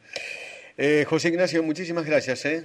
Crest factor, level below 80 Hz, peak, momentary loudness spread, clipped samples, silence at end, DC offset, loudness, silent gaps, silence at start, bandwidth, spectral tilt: 16 dB; -70 dBFS; -8 dBFS; 13 LU; under 0.1%; 0 s; under 0.1%; -24 LUFS; none; 0.1 s; 12 kHz; -5 dB/octave